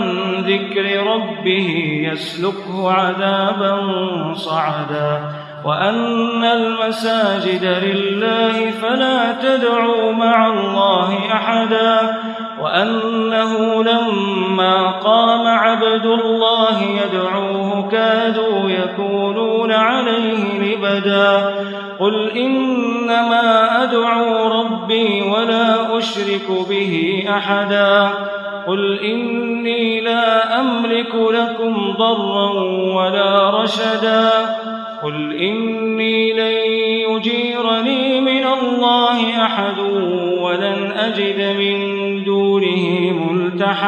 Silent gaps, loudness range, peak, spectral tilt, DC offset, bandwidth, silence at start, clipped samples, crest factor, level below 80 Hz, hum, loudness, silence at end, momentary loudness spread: none; 3 LU; 0 dBFS; -6 dB/octave; under 0.1%; 11.5 kHz; 0 s; under 0.1%; 16 dB; -68 dBFS; none; -16 LUFS; 0 s; 6 LU